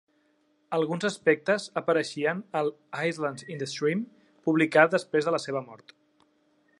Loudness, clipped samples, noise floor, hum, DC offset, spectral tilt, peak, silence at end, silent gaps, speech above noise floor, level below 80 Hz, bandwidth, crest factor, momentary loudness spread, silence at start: -27 LUFS; under 0.1%; -68 dBFS; none; under 0.1%; -5 dB/octave; -4 dBFS; 1.05 s; none; 42 dB; -80 dBFS; 11.5 kHz; 24 dB; 12 LU; 0.7 s